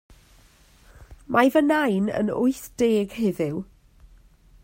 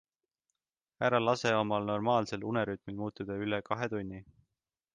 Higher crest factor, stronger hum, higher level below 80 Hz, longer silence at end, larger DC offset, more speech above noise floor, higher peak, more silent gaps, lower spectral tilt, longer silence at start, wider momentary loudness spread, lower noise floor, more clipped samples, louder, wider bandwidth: about the same, 20 dB vs 20 dB; neither; first, -54 dBFS vs -66 dBFS; first, 1 s vs 0.7 s; neither; second, 33 dB vs over 58 dB; first, -4 dBFS vs -14 dBFS; neither; about the same, -6 dB/octave vs -6 dB/octave; about the same, 1 s vs 1 s; about the same, 10 LU vs 11 LU; second, -55 dBFS vs under -90 dBFS; neither; first, -23 LUFS vs -32 LUFS; first, 16 kHz vs 9.6 kHz